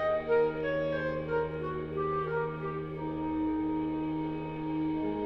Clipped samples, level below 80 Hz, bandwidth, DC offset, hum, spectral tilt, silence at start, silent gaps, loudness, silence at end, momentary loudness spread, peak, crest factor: under 0.1%; -54 dBFS; 5.8 kHz; under 0.1%; none; -9.5 dB/octave; 0 s; none; -32 LUFS; 0 s; 8 LU; -18 dBFS; 14 dB